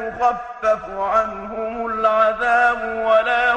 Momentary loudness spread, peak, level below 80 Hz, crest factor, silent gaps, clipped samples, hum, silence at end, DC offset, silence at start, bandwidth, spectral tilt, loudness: 9 LU; -4 dBFS; -48 dBFS; 14 dB; none; under 0.1%; none; 0 s; under 0.1%; 0 s; 9 kHz; -4 dB/octave; -19 LUFS